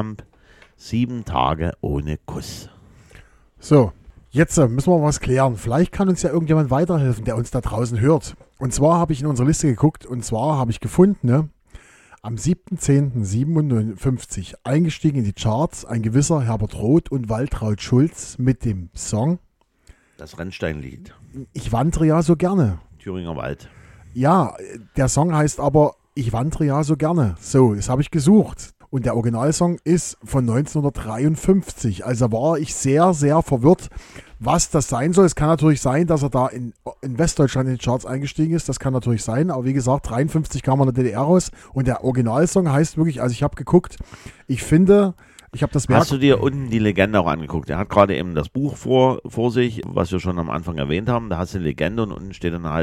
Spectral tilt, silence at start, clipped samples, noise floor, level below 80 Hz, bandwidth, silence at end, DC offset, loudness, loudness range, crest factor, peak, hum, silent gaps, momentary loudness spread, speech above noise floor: -6.5 dB/octave; 0 s; under 0.1%; -52 dBFS; -38 dBFS; 13.5 kHz; 0 s; under 0.1%; -20 LUFS; 4 LU; 18 dB; 0 dBFS; none; none; 11 LU; 33 dB